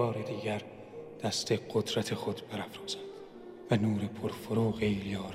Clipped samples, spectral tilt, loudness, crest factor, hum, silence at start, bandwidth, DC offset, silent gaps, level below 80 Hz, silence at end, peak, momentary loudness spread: under 0.1%; -5.5 dB/octave; -34 LUFS; 20 dB; none; 0 s; 15.5 kHz; under 0.1%; none; -62 dBFS; 0 s; -14 dBFS; 17 LU